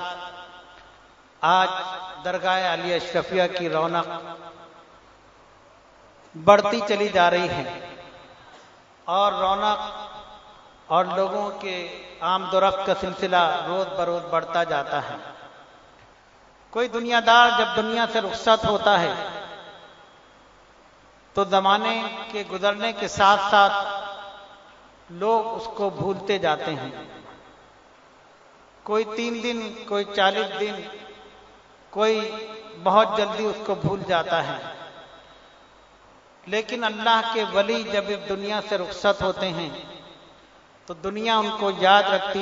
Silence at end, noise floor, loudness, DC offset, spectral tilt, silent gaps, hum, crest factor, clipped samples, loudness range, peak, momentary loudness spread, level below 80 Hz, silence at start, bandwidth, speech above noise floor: 0 s; -53 dBFS; -23 LUFS; under 0.1%; -4 dB/octave; none; none; 24 dB; under 0.1%; 7 LU; 0 dBFS; 20 LU; -58 dBFS; 0 s; 7.8 kHz; 31 dB